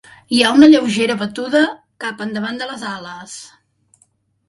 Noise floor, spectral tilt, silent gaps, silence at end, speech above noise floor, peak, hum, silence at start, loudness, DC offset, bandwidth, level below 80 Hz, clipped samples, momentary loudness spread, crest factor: -60 dBFS; -4 dB/octave; none; 1 s; 44 dB; 0 dBFS; none; 0.3 s; -15 LUFS; under 0.1%; 11.5 kHz; -60 dBFS; under 0.1%; 21 LU; 16 dB